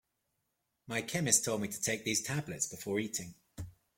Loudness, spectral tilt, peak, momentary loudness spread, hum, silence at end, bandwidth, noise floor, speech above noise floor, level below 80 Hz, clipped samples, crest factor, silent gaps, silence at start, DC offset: -33 LUFS; -3 dB/octave; -10 dBFS; 21 LU; none; 0.25 s; 16.5 kHz; -83 dBFS; 48 dB; -66 dBFS; under 0.1%; 26 dB; none; 0.85 s; under 0.1%